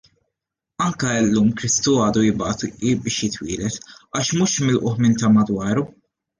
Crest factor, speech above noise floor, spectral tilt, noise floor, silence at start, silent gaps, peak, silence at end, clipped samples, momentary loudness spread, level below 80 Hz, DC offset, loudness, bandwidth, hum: 14 dB; 63 dB; -4.5 dB/octave; -82 dBFS; 0.8 s; none; -6 dBFS; 0.55 s; under 0.1%; 9 LU; -50 dBFS; under 0.1%; -20 LUFS; 10 kHz; none